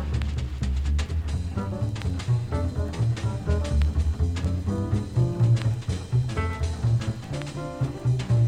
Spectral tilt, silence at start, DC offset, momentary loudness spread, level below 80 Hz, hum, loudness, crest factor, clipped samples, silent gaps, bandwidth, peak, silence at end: -7 dB/octave; 0 s; under 0.1%; 6 LU; -30 dBFS; none; -27 LUFS; 14 dB; under 0.1%; none; 10 kHz; -10 dBFS; 0 s